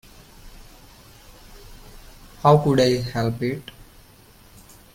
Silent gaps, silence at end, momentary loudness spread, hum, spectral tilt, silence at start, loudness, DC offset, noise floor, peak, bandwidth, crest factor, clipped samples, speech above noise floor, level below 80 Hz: none; 1.35 s; 15 LU; none; -6.5 dB/octave; 0.45 s; -20 LUFS; under 0.1%; -50 dBFS; -4 dBFS; 16.5 kHz; 22 dB; under 0.1%; 31 dB; -46 dBFS